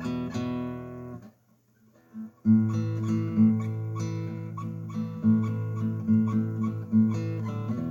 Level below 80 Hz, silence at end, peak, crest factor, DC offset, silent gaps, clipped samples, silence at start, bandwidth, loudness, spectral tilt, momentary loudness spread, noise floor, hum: -64 dBFS; 0 s; -12 dBFS; 16 dB; under 0.1%; none; under 0.1%; 0 s; 7.4 kHz; -28 LUFS; -9 dB/octave; 16 LU; -64 dBFS; none